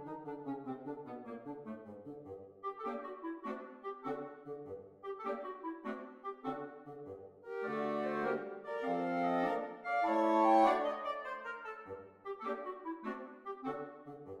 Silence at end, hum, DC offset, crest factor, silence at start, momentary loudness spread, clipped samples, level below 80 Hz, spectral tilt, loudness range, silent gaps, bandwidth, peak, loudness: 0 s; none; under 0.1%; 22 dB; 0 s; 17 LU; under 0.1%; -78 dBFS; -6.5 dB/octave; 12 LU; none; 11.5 kHz; -16 dBFS; -38 LUFS